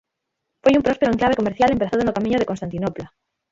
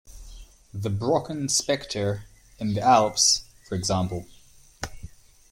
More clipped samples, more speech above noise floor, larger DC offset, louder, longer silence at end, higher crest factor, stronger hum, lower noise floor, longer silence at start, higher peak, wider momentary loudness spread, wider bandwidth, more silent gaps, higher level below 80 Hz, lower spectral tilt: neither; first, 60 dB vs 21 dB; neither; first, -20 LUFS vs -24 LUFS; about the same, 0.45 s vs 0.45 s; about the same, 18 dB vs 22 dB; neither; first, -79 dBFS vs -45 dBFS; first, 0.65 s vs 0.1 s; about the same, -4 dBFS vs -4 dBFS; second, 9 LU vs 18 LU; second, 7.8 kHz vs 16.5 kHz; neither; about the same, -46 dBFS vs -50 dBFS; first, -6.5 dB/octave vs -3.5 dB/octave